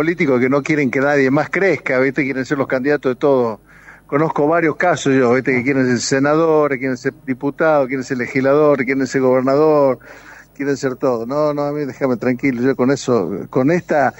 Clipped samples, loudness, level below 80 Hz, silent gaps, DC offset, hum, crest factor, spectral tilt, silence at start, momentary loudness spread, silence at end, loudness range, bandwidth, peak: under 0.1%; -16 LUFS; -54 dBFS; none; under 0.1%; none; 14 dB; -6 dB/octave; 0 s; 7 LU; 0.1 s; 2 LU; 16.5 kHz; -2 dBFS